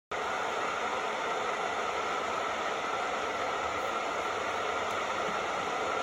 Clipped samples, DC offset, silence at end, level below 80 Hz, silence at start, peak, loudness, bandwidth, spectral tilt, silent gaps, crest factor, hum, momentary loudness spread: under 0.1%; under 0.1%; 0 s; -64 dBFS; 0.1 s; -20 dBFS; -32 LUFS; 16 kHz; -2.5 dB/octave; none; 14 dB; none; 1 LU